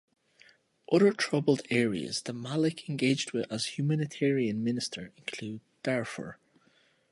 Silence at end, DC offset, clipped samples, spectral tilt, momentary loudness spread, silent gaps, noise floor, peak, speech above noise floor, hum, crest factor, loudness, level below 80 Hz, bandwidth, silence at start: 0.8 s; under 0.1%; under 0.1%; -5.5 dB/octave; 14 LU; none; -67 dBFS; -12 dBFS; 37 dB; none; 20 dB; -30 LUFS; -72 dBFS; 11.5 kHz; 0.9 s